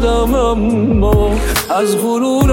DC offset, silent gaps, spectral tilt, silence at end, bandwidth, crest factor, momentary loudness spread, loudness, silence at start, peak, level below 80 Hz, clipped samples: under 0.1%; none; -6 dB/octave; 0 s; 17 kHz; 12 dB; 2 LU; -14 LUFS; 0 s; 0 dBFS; -20 dBFS; under 0.1%